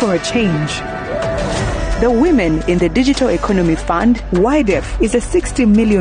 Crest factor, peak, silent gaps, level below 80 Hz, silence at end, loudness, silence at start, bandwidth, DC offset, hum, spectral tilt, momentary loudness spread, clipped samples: 10 dB; -4 dBFS; none; -26 dBFS; 0 s; -15 LUFS; 0 s; 10 kHz; under 0.1%; none; -6 dB/octave; 7 LU; under 0.1%